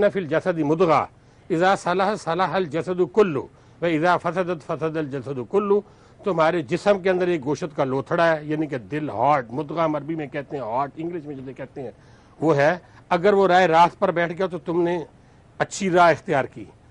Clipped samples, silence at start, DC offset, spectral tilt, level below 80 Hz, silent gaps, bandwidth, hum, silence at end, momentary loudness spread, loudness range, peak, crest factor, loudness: under 0.1%; 0 s; under 0.1%; -6 dB/octave; -58 dBFS; none; 10.5 kHz; none; 0.25 s; 13 LU; 6 LU; -6 dBFS; 16 dB; -22 LUFS